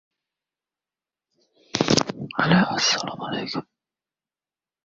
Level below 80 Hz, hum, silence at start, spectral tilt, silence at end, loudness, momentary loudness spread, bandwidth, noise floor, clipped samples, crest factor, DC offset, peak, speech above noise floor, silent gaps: -58 dBFS; none; 1.75 s; -4 dB/octave; 1.25 s; -22 LUFS; 12 LU; 7.8 kHz; under -90 dBFS; under 0.1%; 26 dB; under 0.1%; 0 dBFS; over 67 dB; none